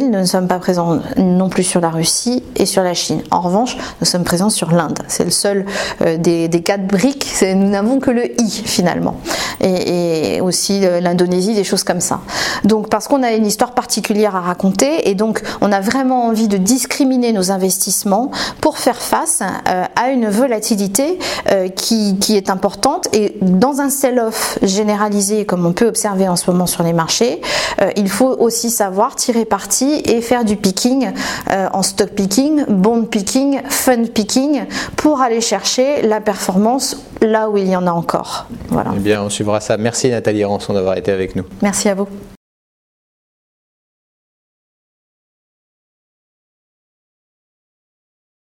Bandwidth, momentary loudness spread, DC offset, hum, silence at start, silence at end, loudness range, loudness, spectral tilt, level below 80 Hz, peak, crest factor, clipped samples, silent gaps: 17 kHz; 4 LU; under 0.1%; none; 0 s; 6.05 s; 2 LU; -15 LUFS; -4 dB/octave; -46 dBFS; 0 dBFS; 16 dB; under 0.1%; none